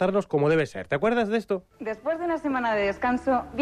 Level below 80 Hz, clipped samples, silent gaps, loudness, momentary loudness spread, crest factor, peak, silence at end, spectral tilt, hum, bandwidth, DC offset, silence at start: -54 dBFS; under 0.1%; none; -26 LUFS; 7 LU; 14 dB; -12 dBFS; 0 s; -7 dB/octave; none; 11.5 kHz; under 0.1%; 0 s